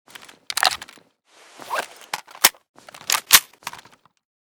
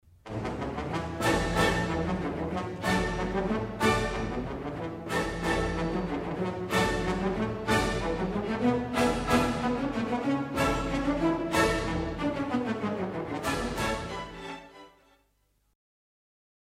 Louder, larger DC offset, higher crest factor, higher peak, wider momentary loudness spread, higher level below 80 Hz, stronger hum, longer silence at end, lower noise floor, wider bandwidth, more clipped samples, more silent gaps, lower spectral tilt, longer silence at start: first, -19 LUFS vs -29 LUFS; neither; first, 24 dB vs 18 dB; first, 0 dBFS vs -10 dBFS; first, 21 LU vs 8 LU; second, -62 dBFS vs -42 dBFS; neither; second, 0.65 s vs 1.9 s; second, -54 dBFS vs -71 dBFS; first, over 20 kHz vs 16 kHz; neither; first, 2.69-2.74 s vs none; second, 2 dB/octave vs -5.5 dB/octave; first, 0.5 s vs 0.25 s